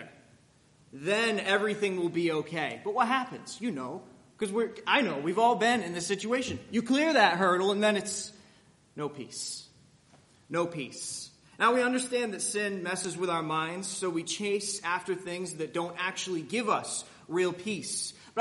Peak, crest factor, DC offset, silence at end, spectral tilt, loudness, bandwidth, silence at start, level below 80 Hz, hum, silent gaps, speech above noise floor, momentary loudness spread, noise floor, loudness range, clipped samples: -8 dBFS; 24 dB; under 0.1%; 0 s; -3.5 dB/octave; -30 LUFS; 11.5 kHz; 0 s; -74 dBFS; none; none; 32 dB; 12 LU; -62 dBFS; 6 LU; under 0.1%